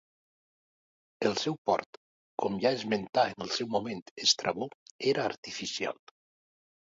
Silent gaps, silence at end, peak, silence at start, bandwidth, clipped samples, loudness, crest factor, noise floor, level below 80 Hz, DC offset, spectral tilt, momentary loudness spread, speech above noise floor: 1.58-1.65 s, 1.86-2.38 s, 3.09-3.13 s, 4.02-4.16 s, 4.75-4.99 s, 5.37-5.43 s; 1 s; -10 dBFS; 1.2 s; 7.8 kHz; under 0.1%; -31 LUFS; 22 dB; under -90 dBFS; -72 dBFS; under 0.1%; -3 dB/octave; 10 LU; over 59 dB